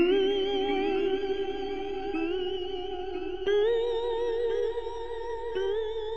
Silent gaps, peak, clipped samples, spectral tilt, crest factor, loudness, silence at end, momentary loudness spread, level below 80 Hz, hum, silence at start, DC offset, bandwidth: none; -14 dBFS; under 0.1%; -5.5 dB/octave; 14 dB; -30 LUFS; 0 s; 9 LU; -50 dBFS; none; 0 s; 0.9%; 7.4 kHz